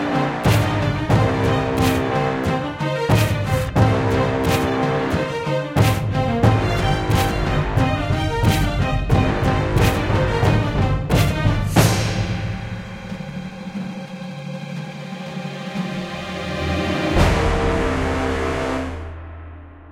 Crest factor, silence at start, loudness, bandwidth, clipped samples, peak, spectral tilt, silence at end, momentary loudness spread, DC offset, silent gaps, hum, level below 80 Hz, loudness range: 18 dB; 0 s; -20 LUFS; 16.5 kHz; under 0.1%; -2 dBFS; -6 dB/octave; 0 s; 13 LU; under 0.1%; none; none; -30 dBFS; 9 LU